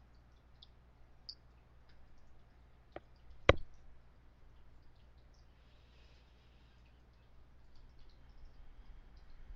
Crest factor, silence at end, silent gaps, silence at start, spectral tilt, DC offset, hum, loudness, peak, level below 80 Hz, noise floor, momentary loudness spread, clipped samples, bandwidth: 40 dB; 0 s; none; 0 s; -3.5 dB/octave; under 0.1%; none; -36 LUFS; -6 dBFS; -54 dBFS; -63 dBFS; 26 LU; under 0.1%; 7.2 kHz